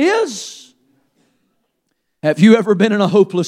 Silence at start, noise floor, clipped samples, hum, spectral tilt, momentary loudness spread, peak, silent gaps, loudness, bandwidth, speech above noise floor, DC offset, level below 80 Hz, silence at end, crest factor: 0 s; -70 dBFS; under 0.1%; none; -6 dB/octave; 14 LU; 0 dBFS; none; -14 LUFS; 11.5 kHz; 57 dB; under 0.1%; -68 dBFS; 0 s; 16 dB